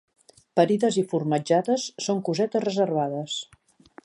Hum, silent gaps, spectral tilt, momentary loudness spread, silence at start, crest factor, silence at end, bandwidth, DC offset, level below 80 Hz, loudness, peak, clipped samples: none; none; -5.5 dB/octave; 8 LU; 0.55 s; 20 dB; 0.6 s; 11.5 kHz; under 0.1%; -72 dBFS; -25 LUFS; -6 dBFS; under 0.1%